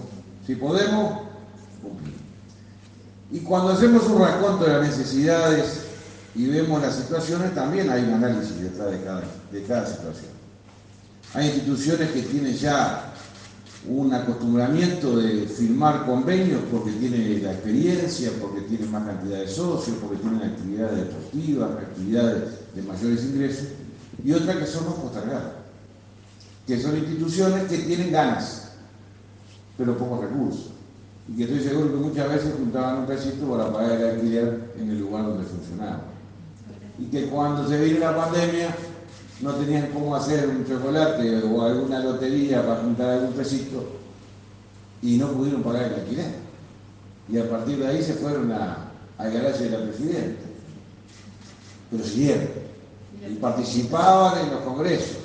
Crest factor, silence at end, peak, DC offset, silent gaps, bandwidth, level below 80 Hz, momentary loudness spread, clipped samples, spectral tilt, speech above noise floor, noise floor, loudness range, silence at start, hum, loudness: 20 dB; 0 s; -4 dBFS; under 0.1%; none; 9.4 kHz; -58 dBFS; 18 LU; under 0.1%; -6.5 dB/octave; 25 dB; -48 dBFS; 6 LU; 0 s; none; -24 LUFS